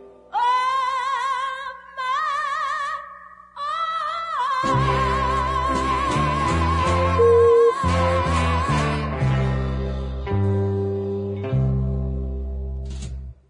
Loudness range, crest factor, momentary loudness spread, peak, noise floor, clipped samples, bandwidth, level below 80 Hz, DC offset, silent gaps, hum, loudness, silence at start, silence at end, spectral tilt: 6 LU; 14 dB; 12 LU; -6 dBFS; -42 dBFS; under 0.1%; 11 kHz; -32 dBFS; under 0.1%; none; 60 Hz at -55 dBFS; -22 LUFS; 0 s; 0.15 s; -6.5 dB/octave